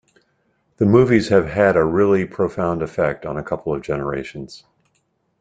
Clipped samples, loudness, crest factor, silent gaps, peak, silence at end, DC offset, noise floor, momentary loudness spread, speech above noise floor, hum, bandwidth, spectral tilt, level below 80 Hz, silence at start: under 0.1%; -18 LUFS; 18 dB; none; -2 dBFS; 0.85 s; under 0.1%; -67 dBFS; 13 LU; 49 dB; none; 9 kHz; -7.5 dB/octave; -48 dBFS; 0.8 s